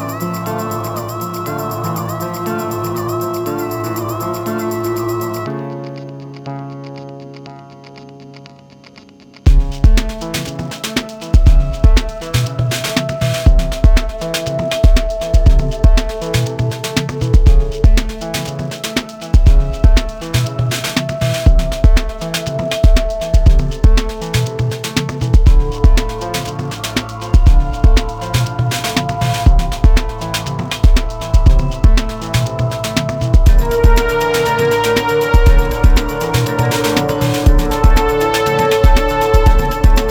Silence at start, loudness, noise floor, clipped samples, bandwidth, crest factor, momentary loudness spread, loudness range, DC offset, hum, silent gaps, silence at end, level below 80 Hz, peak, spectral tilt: 0 s; -16 LUFS; -40 dBFS; under 0.1%; 18.5 kHz; 12 dB; 9 LU; 7 LU; under 0.1%; none; none; 0 s; -14 dBFS; 0 dBFS; -5.5 dB/octave